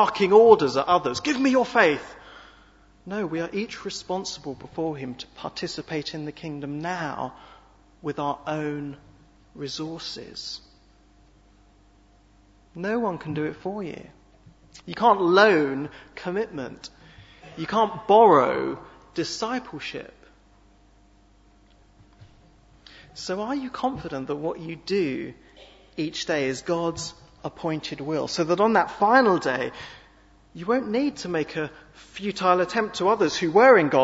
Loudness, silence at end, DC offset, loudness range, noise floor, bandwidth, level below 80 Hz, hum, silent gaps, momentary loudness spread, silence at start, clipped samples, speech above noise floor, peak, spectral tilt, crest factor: -24 LUFS; 0 s; under 0.1%; 12 LU; -56 dBFS; 8 kHz; -58 dBFS; none; none; 19 LU; 0 s; under 0.1%; 33 dB; -2 dBFS; -5 dB/octave; 24 dB